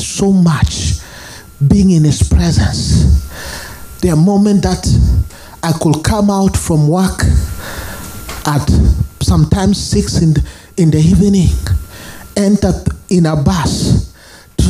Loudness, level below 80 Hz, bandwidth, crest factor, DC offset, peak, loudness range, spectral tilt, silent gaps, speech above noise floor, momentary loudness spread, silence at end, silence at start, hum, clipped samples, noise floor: -12 LUFS; -20 dBFS; 15.5 kHz; 12 dB; under 0.1%; 0 dBFS; 2 LU; -6 dB/octave; none; 28 dB; 15 LU; 0 s; 0 s; none; under 0.1%; -38 dBFS